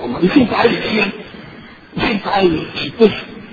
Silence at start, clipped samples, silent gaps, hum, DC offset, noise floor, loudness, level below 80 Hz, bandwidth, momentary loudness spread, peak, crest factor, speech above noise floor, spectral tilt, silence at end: 0 s; under 0.1%; none; none; under 0.1%; -37 dBFS; -15 LUFS; -42 dBFS; 7 kHz; 19 LU; 0 dBFS; 16 dB; 22 dB; -7.5 dB/octave; 0 s